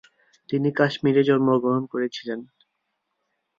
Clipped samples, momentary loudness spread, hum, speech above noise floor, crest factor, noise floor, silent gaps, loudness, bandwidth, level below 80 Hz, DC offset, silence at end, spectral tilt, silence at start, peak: under 0.1%; 13 LU; none; 55 dB; 18 dB; -77 dBFS; none; -22 LUFS; 7.2 kHz; -68 dBFS; under 0.1%; 1.15 s; -7.5 dB/octave; 0.5 s; -6 dBFS